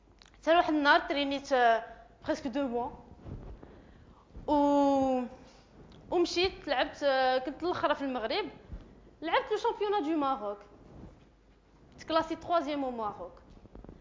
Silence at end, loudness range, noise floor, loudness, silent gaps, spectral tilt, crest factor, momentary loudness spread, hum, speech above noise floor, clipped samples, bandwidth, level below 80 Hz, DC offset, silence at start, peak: 0.05 s; 5 LU; -61 dBFS; -30 LUFS; none; -4.5 dB/octave; 20 dB; 21 LU; none; 32 dB; under 0.1%; 7.6 kHz; -56 dBFS; under 0.1%; 0.45 s; -12 dBFS